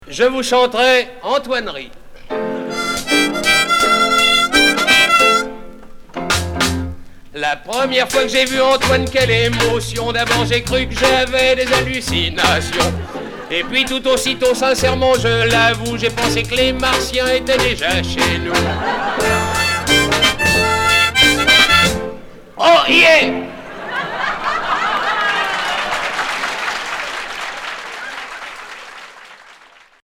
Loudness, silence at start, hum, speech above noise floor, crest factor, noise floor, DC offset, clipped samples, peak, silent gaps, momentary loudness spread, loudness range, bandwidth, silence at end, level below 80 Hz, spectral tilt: -14 LUFS; 0 s; none; 31 dB; 16 dB; -46 dBFS; under 0.1%; under 0.1%; 0 dBFS; none; 15 LU; 7 LU; 20 kHz; 0.7 s; -34 dBFS; -3 dB/octave